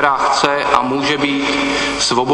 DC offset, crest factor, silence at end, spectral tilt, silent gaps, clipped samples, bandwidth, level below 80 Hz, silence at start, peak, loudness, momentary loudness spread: under 0.1%; 16 dB; 0 s; -3 dB/octave; none; under 0.1%; 10.5 kHz; -44 dBFS; 0 s; 0 dBFS; -15 LUFS; 2 LU